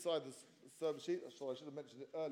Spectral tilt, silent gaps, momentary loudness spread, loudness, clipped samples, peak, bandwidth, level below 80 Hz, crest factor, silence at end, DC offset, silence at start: -4.5 dB/octave; none; 14 LU; -45 LUFS; under 0.1%; -28 dBFS; 16 kHz; under -90 dBFS; 16 dB; 0 s; under 0.1%; 0 s